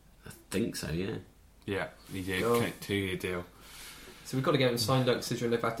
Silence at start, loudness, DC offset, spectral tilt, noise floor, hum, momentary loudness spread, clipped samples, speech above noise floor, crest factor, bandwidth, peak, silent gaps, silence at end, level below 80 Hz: 0.25 s; -32 LUFS; under 0.1%; -5 dB/octave; -52 dBFS; none; 19 LU; under 0.1%; 21 dB; 20 dB; 16.5 kHz; -14 dBFS; none; 0 s; -58 dBFS